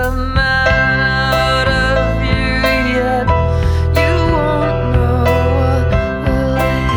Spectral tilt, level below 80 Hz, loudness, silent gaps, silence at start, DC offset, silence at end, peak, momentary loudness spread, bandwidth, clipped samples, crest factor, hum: -6.5 dB/octave; -20 dBFS; -14 LUFS; none; 0 s; under 0.1%; 0 s; 0 dBFS; 3 LU; over 20 kHz; under 0.1%; 14 dB; none